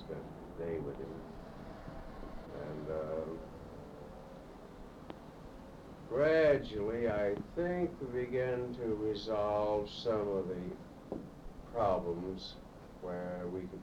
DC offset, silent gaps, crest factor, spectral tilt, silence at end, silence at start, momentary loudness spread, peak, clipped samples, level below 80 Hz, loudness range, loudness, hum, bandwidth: under 0.1%; none; 20 dB; -7 dB/octave; 0 s; 0 s; 19 LU; -18 dBFS; under 0.1%; -56 dBFS; 11 LU; -37 LUFS; none; 15 kHz